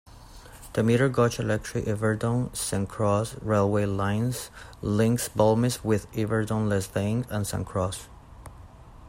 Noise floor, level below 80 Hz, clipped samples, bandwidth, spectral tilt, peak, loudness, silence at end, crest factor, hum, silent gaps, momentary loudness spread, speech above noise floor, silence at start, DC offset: -47 dBFS; -50 dBFS; under 0.1%; 16 kHz; -6 dB/octave; -8 dBFS; -26 LUFS; 0 s; 18 dB; none; none; 10 LU; 21 dB; 0.15 s; under 0.1%